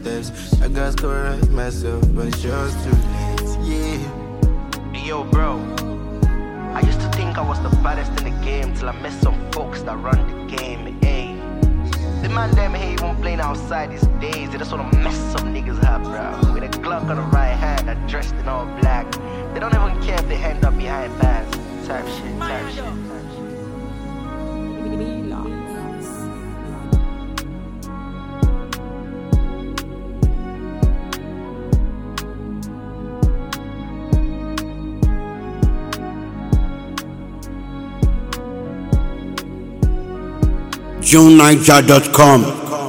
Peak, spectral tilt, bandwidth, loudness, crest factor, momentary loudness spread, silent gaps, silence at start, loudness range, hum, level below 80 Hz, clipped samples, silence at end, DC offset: 0 dBFS; -5.5 dB/octave; 17.5 kHz; -19 LUFS; 18 dB; 11 LU; none; 0 s; 5 LU; none; -22 dBFS; 0.1%; 0 s; under 0.1%